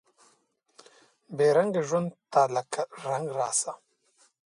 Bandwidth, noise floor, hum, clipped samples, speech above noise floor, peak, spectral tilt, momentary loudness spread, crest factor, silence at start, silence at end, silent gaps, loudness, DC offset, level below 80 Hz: 11.5 kHz; -69 dBFS; none; under 0.1%; 42 dB; -10 dBFS; -4 dB/octave; 12 LU; 20 dB; 1.3 s; 0.75 s; none; -27 LUFS; under 0.1%; -78 dBFS